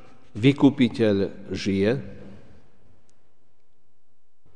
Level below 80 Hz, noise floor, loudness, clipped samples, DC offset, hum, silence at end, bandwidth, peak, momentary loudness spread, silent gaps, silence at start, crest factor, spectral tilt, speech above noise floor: -58 dBFS; -69 dBFS; -22 LUFS; under 0.1%; 1%; none; 2.2 s; 9.8 kHz; -6 dBFS; 12 LU; none; 0.35 s; 20 dB; -7 dB/octave; 47 dB